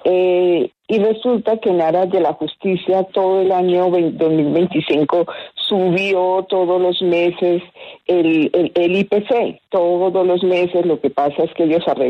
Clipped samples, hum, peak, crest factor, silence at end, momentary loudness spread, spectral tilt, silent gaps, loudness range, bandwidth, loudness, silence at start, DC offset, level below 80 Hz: under 0.1%; none; -4 dBFS; 12 dB; 0 s; 4 LU; -8 dB/octave; none; 1 LU; 6 kHz; -16 LUFS; 0.05 s; under 0.1%; -62 dBFS